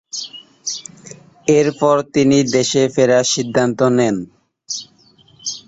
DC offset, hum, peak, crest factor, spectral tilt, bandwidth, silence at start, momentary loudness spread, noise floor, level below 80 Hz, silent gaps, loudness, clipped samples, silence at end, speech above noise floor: under 0.1%; none; -2 dBFS; 16 dB; -4.5 dB/octave; 8 kHz; 0.15 s; 14 LU; -51 dBFS; -56 dBFS; none; -16 LUFS; under 0.1%; 0.1 s; 36 dB